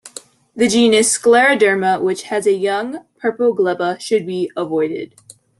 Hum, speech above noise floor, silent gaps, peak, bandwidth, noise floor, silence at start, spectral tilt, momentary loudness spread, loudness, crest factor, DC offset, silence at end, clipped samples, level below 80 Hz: none; 24 dB; none; -2 dBFS; 12.5 kHz; -39 dBFS; 0.05 s; -3 dB/octave; 12 LU; -16 LUFS; 14 dB; under 0.1%; 0.55 s; under 0.1%; -62 dBFS